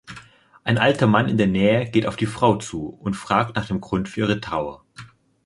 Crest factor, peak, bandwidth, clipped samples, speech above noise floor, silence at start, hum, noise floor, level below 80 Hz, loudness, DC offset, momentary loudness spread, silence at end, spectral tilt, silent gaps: 20 dB; -2 dBFS; 11.5 kHz; under 0.1%; 27 dB; 0.1 s; none; -47 dBFS; -48 dBFS; -21 LUFS; under 0.1%; 13 LU; 0.4 s; -6.5 dB/octave; none